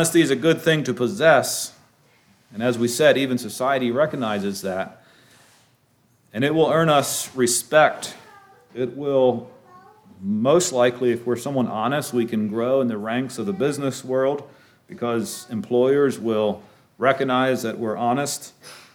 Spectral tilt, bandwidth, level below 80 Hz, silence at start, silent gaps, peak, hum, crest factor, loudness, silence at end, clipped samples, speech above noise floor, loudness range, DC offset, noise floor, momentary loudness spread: -4.5 dB/octave; 19 kHz; -70 dBFS; 0 s; none; -4 dBFS; none; 18 dB; -21 LUFS; 0.15 s; under 0.1%; 41 dB; 4 LU; under 0.1%; -61 dBFS; 12 LU